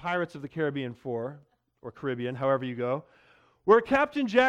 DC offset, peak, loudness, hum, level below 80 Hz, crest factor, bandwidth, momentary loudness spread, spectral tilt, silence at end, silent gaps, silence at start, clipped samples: under 0.1%; -8 dBFS; -28 LUFS; none; -64 dBFS; 20 dB; 9.4 kHz; 13 LU; -6.5 dB/octave; 0 s; none; 0 s; under 0.1%